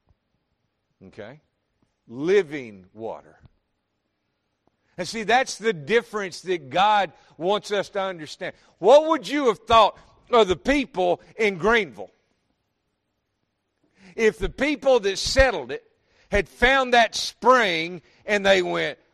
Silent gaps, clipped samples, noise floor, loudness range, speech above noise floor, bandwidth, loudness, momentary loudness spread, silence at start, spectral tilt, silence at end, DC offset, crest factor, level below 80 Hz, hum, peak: none; under 0.1%; -76 dBFS; 9 LU; 54 dB; 13 kHz; -21 LUFS; 18 LU; 1.05 s; -3.5 dB/octave; 0.2 s; under 0.1%; 20 dB; -44 dBFS; none; -4 dBFS